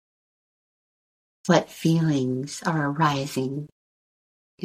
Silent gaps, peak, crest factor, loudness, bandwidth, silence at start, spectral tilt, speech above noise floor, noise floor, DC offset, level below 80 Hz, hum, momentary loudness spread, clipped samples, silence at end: 3.72-4.58 s; -4 dBFS; 22 dB; -24 LUFS; 15.5 kHz; 1.45 s; -6 dB/octave; over 67 dB; under -90 dBFS; under 0.1%; -64 dBFS; none; 11 LU; under 0.1%; 0 s